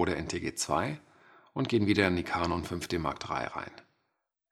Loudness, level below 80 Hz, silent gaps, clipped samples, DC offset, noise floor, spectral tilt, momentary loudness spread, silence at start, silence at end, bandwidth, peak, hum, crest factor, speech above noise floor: -31 LUFS; -58 dBFS; none; under 0.1%; under 0.1%; -82 dBFS; -5 dB/octave; 13 LU; 0 s; 0.7 s; 15 kHz; -8 dBFS; none; 24 dB; 51 dB